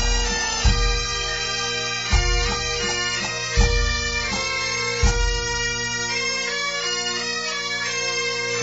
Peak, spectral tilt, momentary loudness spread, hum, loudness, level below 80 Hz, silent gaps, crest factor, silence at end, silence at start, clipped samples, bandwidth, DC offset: -6 dBFS; -2 dB/octave; 3 LU; 60 Hz at -55 dBFS; -22 LUFS; -26 dBFS; none; 16 dB; 0 s; 0 s; under 0.1%; 8 kHz; 0.2%